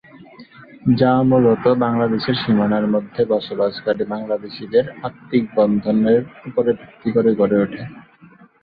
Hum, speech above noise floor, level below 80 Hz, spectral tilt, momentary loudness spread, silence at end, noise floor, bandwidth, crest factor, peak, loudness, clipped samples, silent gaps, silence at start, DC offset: none; 30 dB; -54 dBFS; -10.5 dB/octave; 10 LU; 0.6 s; -47 dBFS; 5 kHz; 16 dB; -2 dBFS; -18 LUFS; under 0.1%; none; 0.15 s; under 0.1%